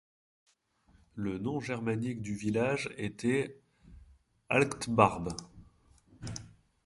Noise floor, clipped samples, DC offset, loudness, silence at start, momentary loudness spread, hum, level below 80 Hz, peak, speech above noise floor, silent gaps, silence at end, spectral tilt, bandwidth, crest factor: -67 dBFS; under 0.1%; under 0.1%; -32 LUFS; 1.15 s; 17 LU; none; -58 dBFS; -8 dBFS; 36 dB; none; 0.4 s; -6 dB/octave; 11.5 kHz; 26 dB